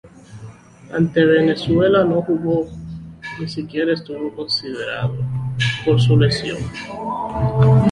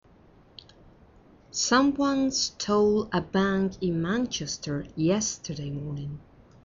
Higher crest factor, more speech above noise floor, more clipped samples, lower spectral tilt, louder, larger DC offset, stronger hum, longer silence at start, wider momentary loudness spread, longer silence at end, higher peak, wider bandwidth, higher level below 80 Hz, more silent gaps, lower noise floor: about the same, 16 dB vs 20 dB; second, 22 dB vs 30 dB; neither; first, -7 dB/octave vs -4.5 dB/octave; first, -19 LUFS vs -27 LUFS; neither; neither; second, 0.05 s vs 1.55 s; first, 15 LU vs 12 LU; second, 0 s vs 0.45 s; first, -2 dBFS vs -8 dBFS; first, 10.5 kHz vs 7.6 kHz; first, -42 dBFS vs -54 dBFS; neither; second, -39 dBFS vs -56 dBFS